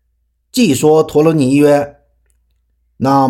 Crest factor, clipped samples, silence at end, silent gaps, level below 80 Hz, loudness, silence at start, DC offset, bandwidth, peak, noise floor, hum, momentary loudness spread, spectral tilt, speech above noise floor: 12 dB; under 0.1%; 0 s; none; -50 dBFS; -12 LUFS; 0.55 s; under 0.1%; 17 kHz; 0 dBFS; -63 dBFS; none; 10 LU; -6 dB/octave; 53 dB